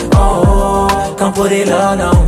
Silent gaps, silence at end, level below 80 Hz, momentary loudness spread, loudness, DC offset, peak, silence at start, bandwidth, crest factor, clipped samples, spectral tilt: none; 0 s; -16 dBFS; 3 LU; -12 LUFS; under 0.1%; 0 dBFS; 0 s; 15.5 kHz; 10 dB; under 0.1%; -6 dB/octave